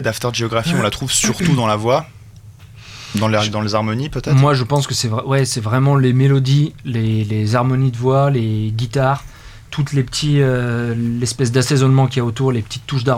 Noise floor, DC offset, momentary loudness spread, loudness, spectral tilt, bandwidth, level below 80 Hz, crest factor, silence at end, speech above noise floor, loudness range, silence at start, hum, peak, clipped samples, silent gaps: -39 dBFS; under 0.1%; 7 LU; -17 LUFS; -5.5 dB/octave; 15 kHz; -42 dBFS; 14 dB; 0 s; 23 dB; 3 LU; 0 s; none; -2 dBFS; under 0.1%; none